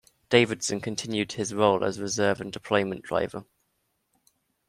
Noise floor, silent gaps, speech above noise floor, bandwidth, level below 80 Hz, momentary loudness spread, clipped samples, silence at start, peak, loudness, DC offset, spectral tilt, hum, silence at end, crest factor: -75 dBFS; none; 49 dB; 13.5 kHz; -64 dBFS; 8 LU; under 0.1%; 0.3 s; -6 dBFS; -26 LUFS; under 0.1%; -4 dB/octave; none; 1.25 s; 22 dB